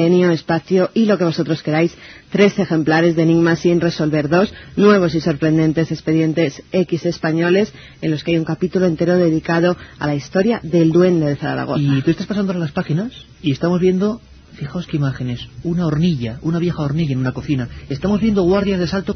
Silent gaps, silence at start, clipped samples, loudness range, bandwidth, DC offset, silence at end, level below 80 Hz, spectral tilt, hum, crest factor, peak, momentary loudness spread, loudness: none; 0 s; under 0.1%; 5 LU; 6.6 kHz; under 0.1%; 0 s; -44 dBFS; -7.5 dB/octave; none; 16 dB; 0 dBFS; 8 LU; -17 LUFS